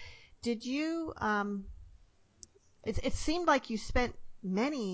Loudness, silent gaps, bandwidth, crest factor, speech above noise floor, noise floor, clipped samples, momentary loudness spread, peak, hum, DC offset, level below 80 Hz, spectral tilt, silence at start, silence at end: -34 LUFS; none; 8 kHz; 20 dB; 30 dB; -62 dBFS; under 0.1%; 13 LU; -14 dBFS; none; under 0.1%; -48 dBFS; -5 dB/octave; 0 s; 0 s